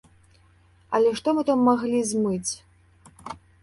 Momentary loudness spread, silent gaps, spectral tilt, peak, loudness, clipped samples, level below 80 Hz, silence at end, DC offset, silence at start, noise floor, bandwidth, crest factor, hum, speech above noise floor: 20 LU; none; -5 dB/octave; -8 dBFS; -23 LUFS; under 0.1%; -60 dBFS; 0.25 s; under 0.1%; 0.9 s; -57 dBFS; 11.5 kHz; 18 dB; none; 35 dB